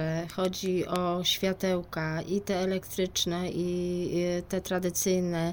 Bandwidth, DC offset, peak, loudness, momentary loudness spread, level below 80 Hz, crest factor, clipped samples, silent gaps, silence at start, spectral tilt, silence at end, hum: over 20 kHz; under 0.1%; -12 dBFS; -30 LUFS; 5 LU; -54 dBFS; 18 dB; under 0.1%; none; 0 s; -4.5 dB/octave; 0 s; none